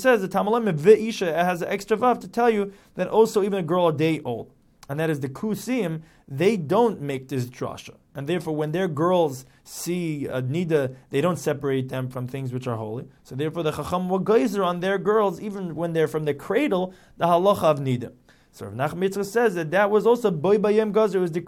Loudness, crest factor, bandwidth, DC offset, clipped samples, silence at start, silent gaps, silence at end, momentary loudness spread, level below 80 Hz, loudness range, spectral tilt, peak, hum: -23 LUFS; 20 dB; 16.5 kHz; under 0.1%; under 0.1%; 0 s; none; 0 s; 12 LU; -60 dBFS; 5 LU; -6.5 dB/octave; -4 dBFS; none